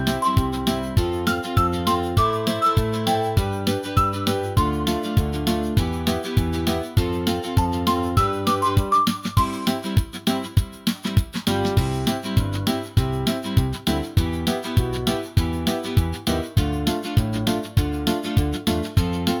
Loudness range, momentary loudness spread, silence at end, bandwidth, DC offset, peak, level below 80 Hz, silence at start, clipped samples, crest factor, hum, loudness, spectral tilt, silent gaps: 2 LU; 4 LU; 0 s; 19.5 kHz; under 0.1%; -6 dBFS; -34 dBFS; 0 s; under 0.1%; 16 dB; none; -22 LUFS; -6 dB/octave; none